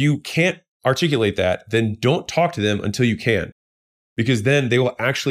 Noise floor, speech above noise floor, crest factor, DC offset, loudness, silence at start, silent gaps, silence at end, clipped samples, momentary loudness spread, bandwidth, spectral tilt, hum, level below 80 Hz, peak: under -90 dBFS; over 71 dB; 16 dB; under 0.1%; -20 LUFS; 0 s; 0.68-0.80 s, 3.52-4.16 s; 0 s; under 0.1%; 5 LU; 15.5 kHz; -5.5 dB/octave; none; -56 dBFS; -4 dBFS